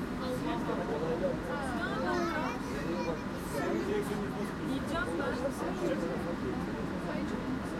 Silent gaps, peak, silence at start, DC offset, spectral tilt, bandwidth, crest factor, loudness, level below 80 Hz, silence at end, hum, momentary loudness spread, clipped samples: none; -20 dBFS; 0 s; under 0.1%; -6 dB/octave; 16 kHz; 14 dB; -34 LUFS; -50 dBFS; 0 s; none; 4 LU; under 0.1%